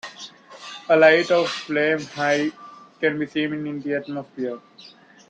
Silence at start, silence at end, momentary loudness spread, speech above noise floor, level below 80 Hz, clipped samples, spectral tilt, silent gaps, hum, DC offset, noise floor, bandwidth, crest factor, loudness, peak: 0.05 s; 0.45 s; 22 LU; 21 dB; -70 dBFS; under 0.1%; -4.5 dB/octave; none; none; under 0.1%; -42 dBFS; 9.2 kHz; 20 dB; -21 LUFS; -4 dBFS